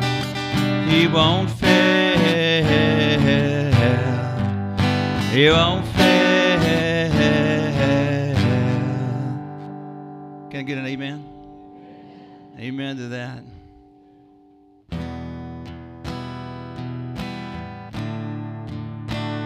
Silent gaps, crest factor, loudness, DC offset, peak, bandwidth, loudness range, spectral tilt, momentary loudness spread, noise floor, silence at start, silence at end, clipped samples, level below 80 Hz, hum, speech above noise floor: none; 20 dB; -19 LUFS; under 0.1%; -2 dBFS; 16 kHz; 18 LU; -6 dB/octave; 19 LU; -52 dBFS; 0 s; 0 s; under 0.1%; -44 dBFS; none; 33 dB